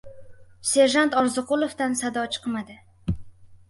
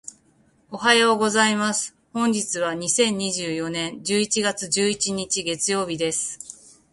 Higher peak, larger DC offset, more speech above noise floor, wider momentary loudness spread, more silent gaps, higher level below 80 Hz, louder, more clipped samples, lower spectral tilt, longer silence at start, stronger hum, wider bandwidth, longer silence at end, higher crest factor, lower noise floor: second, -6 dBFS vs -2 dBFS; neither; second, 20 dB vs 38 dB; first, 15 LU vs 9 LU; neither; first, -46 dBFS vs -62 dBFS; about the same, -24 LUFS vs -22 LUFS; neither; about the same, -3.5 dB/octave vs -2.5 dB/octave; about the same, 0.05 s vs 0.05 s; neither; about the same, 12 kHz vs 11.5 kHz; second, 0.15 s vs 0.4 s; about the same, 18 dB vs 20 dB; second, -43 dBFS vs -60 dBFS